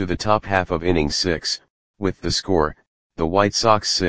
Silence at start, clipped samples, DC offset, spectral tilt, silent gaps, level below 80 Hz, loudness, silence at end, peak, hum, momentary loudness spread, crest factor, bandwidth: 0 s; under 0.1%; 1%; -4 dB/octave; 1.70-1.94 s, 2.87-3.10 s; -40 dBFS; -20 LUFS; 0 s; 0 dBFS; none; 9 LU; 20 dB; 10 kHz